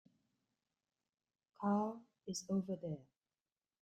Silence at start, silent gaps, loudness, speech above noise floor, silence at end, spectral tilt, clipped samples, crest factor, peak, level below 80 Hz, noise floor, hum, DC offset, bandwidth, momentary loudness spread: 1.6 s; none; -42 LUFS; over 50 dB; 0.8 s; -6 dB/octave; under 0.1%; 20 dB; -24 dBFS; -84 dBFS; under -90 dBFS; none; under 0.1%; 13 kHz; 12 LU